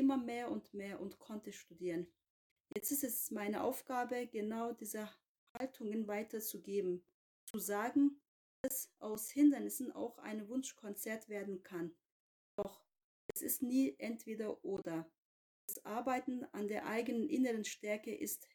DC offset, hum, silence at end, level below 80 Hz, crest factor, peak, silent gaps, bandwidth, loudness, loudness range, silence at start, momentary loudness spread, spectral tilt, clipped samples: under 0.1%; none; 0.1 s; -82 dBFS; 20 dB; -20 dBFS; 2.30-2.64 s, 5.28-5.55 s, 7.14-7.54 s, 8.28-8.64 s, 12.11-12.58 s, 13.04-13.29 s, 15.18-15.68 s; 19.5 kHz; -41 LUFS; 6 LU; 0 s; 13 LU; -4.5 dB/octave; under 0.1%